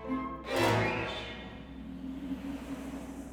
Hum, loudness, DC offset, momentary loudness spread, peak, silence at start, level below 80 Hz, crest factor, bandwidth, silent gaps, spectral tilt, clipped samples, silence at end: none; -35 LUFS; under 0.1%; 16 LU; -16 dBFS; 0 s; -52 dBFS; 20 dB; over 20 kHz; none; -5.5 dB/octave; under 0.1%; 0 s